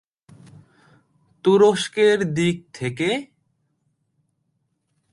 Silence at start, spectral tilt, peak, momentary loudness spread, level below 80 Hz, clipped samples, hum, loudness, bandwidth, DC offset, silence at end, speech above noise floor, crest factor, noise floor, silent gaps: 1.45 s; -5.5 dB/octave; -4 dBFS; 12 LU; -62 dBFS; under 0.1%; none; -20 LUFS; 11.5 kHz; under 0.1%; 1.9 s; 53 dB; 20 dB; -72 dBFS; none